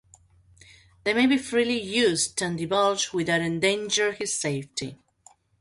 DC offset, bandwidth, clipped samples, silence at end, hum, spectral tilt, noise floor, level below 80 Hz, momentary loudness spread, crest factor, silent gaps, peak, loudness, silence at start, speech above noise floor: under 0.1%; 11.5 kHz; under 0.1%; 0.65 s; none; -3 dB/octave; -58 dBFS; -62 dBFS; 9 LU; 16 dB; none; -10 dBFS; -24 LUFS; 1.05 s; 33 dB